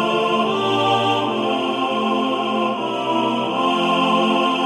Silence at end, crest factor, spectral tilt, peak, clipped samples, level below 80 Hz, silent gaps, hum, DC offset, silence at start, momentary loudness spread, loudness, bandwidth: 0 s; 14 dB; -5 dB/octave; -6 dBFS; under 0.1%; -66 dBFS; none; none; under 0.1%; 0 s; 4 LU; -19 LUFS; 13 kHz